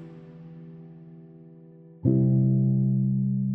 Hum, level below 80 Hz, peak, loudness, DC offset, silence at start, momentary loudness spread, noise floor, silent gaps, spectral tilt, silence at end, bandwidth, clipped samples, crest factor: none; -60 dBFS; -10 dBFS; -24 LUFS; under 0.1%; 0 s; 23 LU; -49 dBFS; none; -15 dB/octave; 0 s; 1.1 kHz; under 0.1%; 16 dB